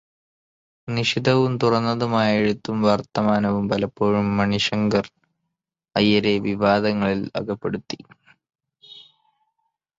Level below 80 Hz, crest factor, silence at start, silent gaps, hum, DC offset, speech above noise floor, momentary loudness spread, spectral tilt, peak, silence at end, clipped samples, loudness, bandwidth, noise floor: -54 dBFS; 20 dB; 0.85 s; none; none; under 0.1%; 61 dB; 9 LU; -6 dB/octave; -4 dBFS; 0.95 s; under 0.1%; -21 LUFS; 7.8 kHz; -82 dBFS